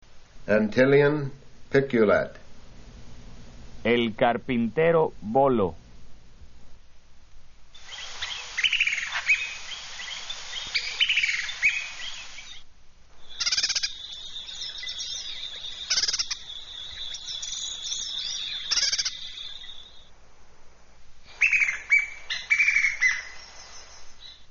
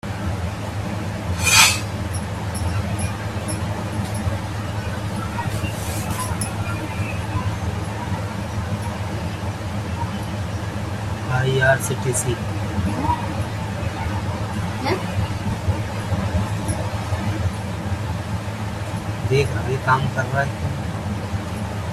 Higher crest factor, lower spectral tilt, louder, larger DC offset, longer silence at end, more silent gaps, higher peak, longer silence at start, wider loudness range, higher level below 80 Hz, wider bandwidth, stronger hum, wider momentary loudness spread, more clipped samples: about the same, 22 dB vs 22 dB; second, -1.5 dB/octave vs -4.5 dB/octave; about the same, -25 LUFS vs -23 LUFS; neither; about the same, 0 s vs 0 s; neither; second, -6 dBFS vs 0 dBFS; about the same, 0.1 s vs 0.05 s; about the same, 6 LU vs 6 LU; second, -52 dBFS vs -40 dBFS; second, 7.2 kHz vs 15 kHz; neither; first, 18 LU vs 7 LU; neither